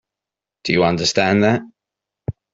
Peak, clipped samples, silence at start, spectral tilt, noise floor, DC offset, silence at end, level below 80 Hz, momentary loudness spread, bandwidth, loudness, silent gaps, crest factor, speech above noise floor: -2 dBFS; under 0.1%; 0.65 s; -5 dB/octave; -87 dBFS; under 0.1%; 0.25 s; -50 dBFS; 16 LU; 8 kHz; -17 LUFS; none; 18 dB; 70 dB